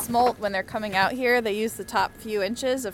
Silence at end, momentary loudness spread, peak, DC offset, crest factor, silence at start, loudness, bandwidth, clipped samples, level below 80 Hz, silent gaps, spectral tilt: 0 s; 6 LU; -8 dBFS; under 0.1%; 18 dB; 0 s; -25 LUFS; 17 kHz; under 0.1%; -54 dBFS; none; -3.5 dB/octave